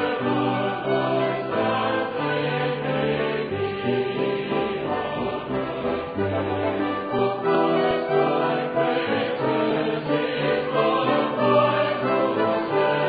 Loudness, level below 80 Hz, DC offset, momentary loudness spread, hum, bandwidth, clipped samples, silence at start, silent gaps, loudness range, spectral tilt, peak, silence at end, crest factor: -23 LUFS; -56 dBFS; under 0.1%; 5 LU; none; 5 kHz; under 0.1%; 0 s; none; 4 LU; -10 dB/octave; -6 dBFS; 0 s; 16 dB